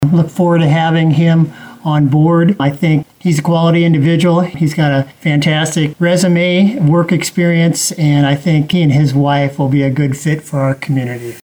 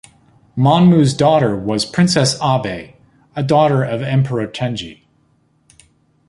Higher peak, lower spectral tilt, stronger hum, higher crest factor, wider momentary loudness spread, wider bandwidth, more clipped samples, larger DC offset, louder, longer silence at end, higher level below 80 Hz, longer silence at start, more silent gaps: about the same, -2 dBFS vs 0 dBFS; about the same, -6 dB/octave vs -6 dB/octave; neither; second, 8 dB vs 16 dB; second, 5 LU vs 15 LU; first, 20 kHz vs 11.5 kHz; neither; neither; first, -12 LUFS vs -15 LUFS; second, 0.05 s vs 1.35 s; about the same, -48 dBFS vs -50 dBFS; second, 0 s vs 0.55 s; neither